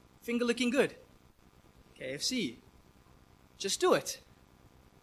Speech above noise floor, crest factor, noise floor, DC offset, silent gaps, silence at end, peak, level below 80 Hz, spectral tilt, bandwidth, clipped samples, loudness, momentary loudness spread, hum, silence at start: 30 dB; 22 dB; -62 dBFS; under 0.1%; none; 0.85 s; -12 dBFS; -66 dBFS; -3 dB/octave; 15 kHz; under 0.1%; -32 LUFS; 13 LU; none; 0.25 s